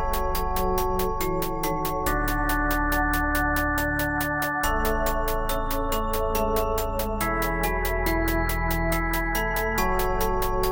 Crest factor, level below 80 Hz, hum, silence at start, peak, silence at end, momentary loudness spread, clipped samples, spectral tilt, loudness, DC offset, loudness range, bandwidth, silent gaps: 14 dB; -30 dBFS; none; 0 s; -10 dBFS; 0 s; 3 LU; under 0.1%; -4.5 dB/octave; -25 LUFS; under 0.1%; 1 LU; 17.5 kHz; none